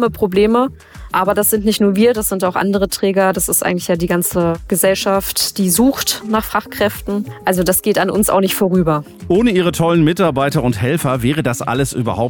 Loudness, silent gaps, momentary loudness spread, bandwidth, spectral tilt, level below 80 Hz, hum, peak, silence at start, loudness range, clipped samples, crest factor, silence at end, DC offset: -15 LUFS; none; 5 LU; 19.5 kHz; -4.5 dB/octave; -38 dBFS; none; -4 dBFS; 0 s; 1 LU; under 0.1%; 12 dB; 0 s; under 0.1%